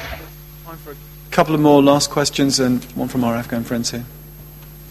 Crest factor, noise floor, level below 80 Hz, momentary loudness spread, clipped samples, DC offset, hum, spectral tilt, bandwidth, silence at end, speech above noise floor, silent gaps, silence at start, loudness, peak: 18 dB; -38 dBFS; -42 dBFS; 25 LU; under 0.1%; under 0.1%; none; -4.5 dB/octave; 15.5 kHz; 0 s; 20 dB; none; 0 s; -17 LUFS; 0 dBFS